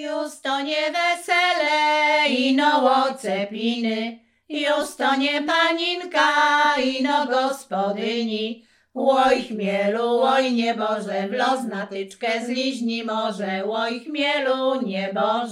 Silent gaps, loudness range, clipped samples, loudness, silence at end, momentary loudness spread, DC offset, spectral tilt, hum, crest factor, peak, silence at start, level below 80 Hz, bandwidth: none; 5 LU; under 0.1%; -21 LUFS; 0 s; 8 LU; under 0.1%; -3.5 dB/octave; none; 16 dB; -6 dBFS; 0 s; -66 dBFS; 15 kHz